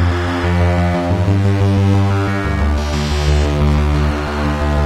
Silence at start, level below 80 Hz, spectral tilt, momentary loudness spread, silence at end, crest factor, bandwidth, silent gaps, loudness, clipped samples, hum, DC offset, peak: 0 s; -20 dBFS; -7 dB/octave; 4 LU; 0 s; 10 dB; 11.5 kHz; none; -16 LUFS; under 0.1%; none; under 0.1%; -4 dBFS